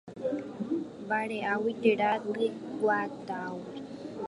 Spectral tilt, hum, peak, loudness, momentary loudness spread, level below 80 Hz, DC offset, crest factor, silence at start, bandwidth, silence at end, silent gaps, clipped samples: -6.5 dB/octave; none; -12 dBFS; -31 LUFS; 12 LU; -72 dBFS; under 0.1%; 20 dB; 0.05 s; 11.5 kHz; 0 s; none; under 0.1%